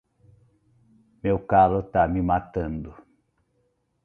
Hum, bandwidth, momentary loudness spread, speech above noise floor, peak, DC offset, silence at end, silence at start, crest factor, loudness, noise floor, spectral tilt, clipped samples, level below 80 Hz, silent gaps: none; 4 kHz; 14 LU; 48 dB; -6 dBFS; under 0.1%; 1.1 s; 1.25 s; 20 dB; -23 LUFS; -70 dBFS; -10.5 dB/octave; under 0.1%; -44 dBFS; none